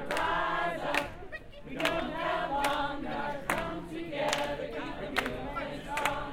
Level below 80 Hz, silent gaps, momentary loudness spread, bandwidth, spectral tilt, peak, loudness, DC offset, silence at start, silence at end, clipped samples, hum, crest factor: -50 dBFS; none; 8 LU; 17 kHz; -3.5 dB/octave; -10 dBFS; -33 LUFS; under 0.1%; 0 s; 0 s; under 0.1%; none; 24 dB